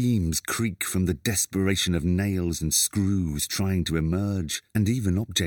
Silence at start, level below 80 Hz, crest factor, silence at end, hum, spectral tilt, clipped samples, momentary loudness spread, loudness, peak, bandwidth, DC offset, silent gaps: 0 s; -46 dBFS; 16 dB; 0 s; none; -4.5 dB/octave; under 0.1%; 4 LU; -25 LUFS; -8 dBFS; over 20 kHz; under 0.1%; none